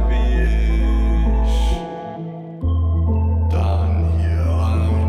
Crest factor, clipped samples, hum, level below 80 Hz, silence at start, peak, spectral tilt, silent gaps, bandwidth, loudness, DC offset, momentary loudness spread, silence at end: 10 dB; under 0.1%; none; -18 dBFS; 0 s; -8 dBFS; -8 dB/octave; none; 9 kHz; -19 LUFS; under 0.1%; 9 LU; 0 s